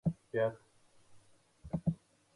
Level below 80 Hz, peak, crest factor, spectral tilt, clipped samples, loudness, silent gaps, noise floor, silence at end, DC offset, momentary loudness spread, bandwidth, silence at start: -60 dBFS; -20 dBFS; 18 dB; -9 dB/octave; under 0.1%; -38 LUFS; none; -63 dBFS; 0.4 s; under 0.1%; 21 LU; 11 kHz; 0.05 s